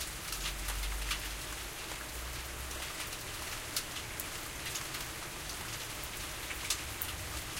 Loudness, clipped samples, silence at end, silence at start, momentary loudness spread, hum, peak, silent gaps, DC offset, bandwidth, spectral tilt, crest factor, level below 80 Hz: -38 LUFS; under 0.1%; 0 s; 0 s; 5 LU; none; -16 dBFS; none; under 0.1%; 17 kHz; -1.5 dB/octave; 24 dB; -46 dBFS